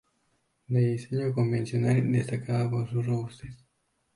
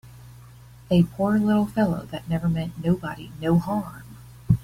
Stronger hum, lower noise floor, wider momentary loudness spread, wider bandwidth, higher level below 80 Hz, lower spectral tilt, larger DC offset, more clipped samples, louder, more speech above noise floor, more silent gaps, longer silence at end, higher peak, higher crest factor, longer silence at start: neither; first, -74 dBFS vs -46 dBFS; second, 7 LU vs 15 LU; second, 11 kHz vs 16 kHz; second, -60 dBFS vs -46 dBFS; about the same, -8.5 dB/octave vs -8.5 dB/octave; neither; neither; second, -28 LUFS vs -24 LUFS; first, 47 dB vs 24 dB; neither; first, 0.6 s vs 0 s; second, -12 dBFS vs -4 dBFS; about the same, 16 dB vs 20 dB; first, 0.7 s vs 0.05 s